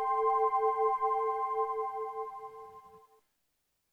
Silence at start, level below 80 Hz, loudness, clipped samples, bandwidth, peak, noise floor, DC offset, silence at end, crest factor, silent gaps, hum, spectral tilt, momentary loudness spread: 0 s; -76 dBFS; -31 LUFS; under 0.1%; 6.6 kHz; -18 dBFS; -80 dBFS; under 0.1%; 0.95 s; 14 dB; none; none; -4 dB/octave; 18 LU